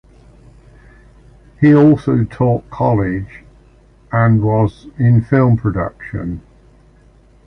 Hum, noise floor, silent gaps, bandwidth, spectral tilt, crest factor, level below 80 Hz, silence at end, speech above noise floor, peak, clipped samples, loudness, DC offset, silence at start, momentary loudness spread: none; -47 dBFS; none; 5.8 kHz; -10.5 dB/octave; 14 dB; -38 dBFS; 1.1 s; 34 dB; -2 dBFS; under 0.1%; -15 LUFS; under 0.1%; 1.6 s; 14 LU